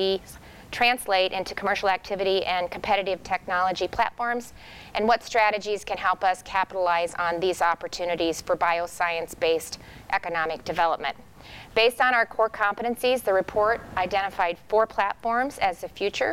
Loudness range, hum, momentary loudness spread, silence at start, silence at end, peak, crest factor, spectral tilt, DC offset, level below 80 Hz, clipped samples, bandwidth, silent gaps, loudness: 2 LU; none; 7 LU; 0 s; 0 s; -8 dBFS; 16 dB; -3 dB/octave; under 0.1%; -54 dBFS; under 0.1%; 16 kHz; none; -25 LUFS